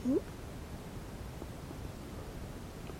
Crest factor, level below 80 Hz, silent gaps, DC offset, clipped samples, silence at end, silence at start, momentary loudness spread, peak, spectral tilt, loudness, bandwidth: 18 dB; -50 dBFS; none; under 0.1%; under 0.1%; 0 s; 0 s; 8 LU; -22 dBFS; -6.5 dB/octave; -43 LUFS; 16 kHz